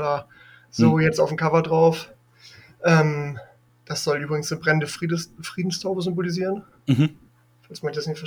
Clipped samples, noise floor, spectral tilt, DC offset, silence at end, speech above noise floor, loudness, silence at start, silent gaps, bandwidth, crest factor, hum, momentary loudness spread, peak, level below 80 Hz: under 0.1%; -50 dBFS; -6 dB/octave; under 0.1%; 0 s; 28 dB; -23 LUFS; 0 s; none; 15 kHz; 18 dB; none; 14 LU; -4 dBFS; -60 dBFS